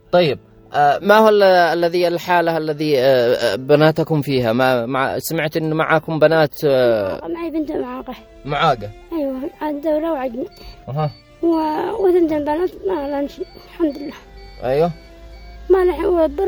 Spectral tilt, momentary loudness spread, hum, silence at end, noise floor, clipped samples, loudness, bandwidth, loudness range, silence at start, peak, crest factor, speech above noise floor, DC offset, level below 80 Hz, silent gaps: -6 dB/octave; 14 LU; none; 0 s; -38 dBFS; under 0.1%; -17 LUFS; over 20 kHz; 7 LU; 0.1 s; 0 dBFS; 18 dB; 21 dB; under 0.1%; -44 dBFS; none